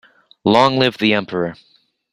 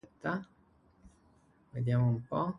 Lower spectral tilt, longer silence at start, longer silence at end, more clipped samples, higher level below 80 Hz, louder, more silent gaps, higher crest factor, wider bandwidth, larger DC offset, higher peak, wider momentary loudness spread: second, -6 dB/octave vs -9.5 dB/octave; first, 0.45 s vs 0.25 s; first, 0.6 s vs 0 s; neither; first, -56 dBFS vs -64 dBFS; first, -16 LUFS vs -33 LUFS; neither; about the same, 18 dB vs 18 dB; first, 13 kHz vs 5.6 kHz; neither; first, 0 dBFS vs -18 dBFS; about the same, 10 LU vs 10 LU